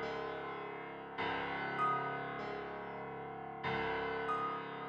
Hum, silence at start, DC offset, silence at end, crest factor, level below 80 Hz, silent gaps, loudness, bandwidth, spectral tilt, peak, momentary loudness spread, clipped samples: none; 0 s; under 0.1%; 0 s; 16 dB; -66 dBFS; none; -40 LUFS; 8.4 kHz; -6.5 dB/octave; -24 dBFS; 10 LU; under 0.1%